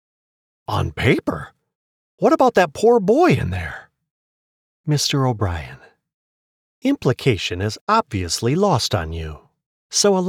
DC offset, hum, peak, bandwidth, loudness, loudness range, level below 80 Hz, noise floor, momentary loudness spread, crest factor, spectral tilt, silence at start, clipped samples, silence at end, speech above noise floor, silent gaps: under 0.1%; none; -4 dBFS; 17 kHz; -19 LUFS; 6 LU; -42 dBFS; under -90 dBFS; 16 LU; 16 dB; -5 dB/octave; 0.7 s; under 0.1%; 0 s; over 72 dB; 1.75-2.18 s, 4.11-4.84 s, 6.14-6.82 s, 7.81-7.87 s, 9.66-9.90 s